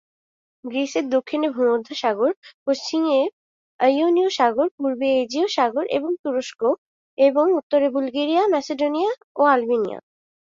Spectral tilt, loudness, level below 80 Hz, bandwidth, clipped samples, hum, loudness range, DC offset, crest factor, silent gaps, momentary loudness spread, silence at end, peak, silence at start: -3.5 dB/octave; -21 LUFS; -70 dBFS; 7.6 kHz; under 0.1%; none; 2 LU; under 0.1%; 16 dB; 2.37-2.42 s, 2.54-2.66 s, 3.33-3.79 s, 4.71-4.78 s, 6.19-6.24 s, 6.78-7.17 s, 7.63-7.70 s, 9.24-9.35 s; 8 LU; 0.55 s; -4 dBFS; 0.65 s